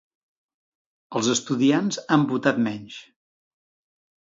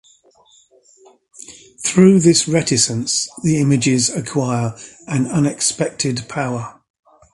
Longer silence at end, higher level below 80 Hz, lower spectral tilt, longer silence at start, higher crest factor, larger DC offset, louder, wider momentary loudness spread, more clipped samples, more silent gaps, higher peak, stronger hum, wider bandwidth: first, 1.3 s vs 0.65 s; second, -70 dBFS vs -52 dBFS; about the same, -4.5 dB/octave vs -4.5 dB/octave; second, 1.1 s vs 1.5 s; about the same, 22 dB vs 18 dB; neither; second, -23 LUFS vs -17 LUFS; about the same, 15 LU vs 15 LU; neither; neither; second, -4 dBFS vs 0 dBFS; neither; second, 7.8 kHz vs 11.5 kHz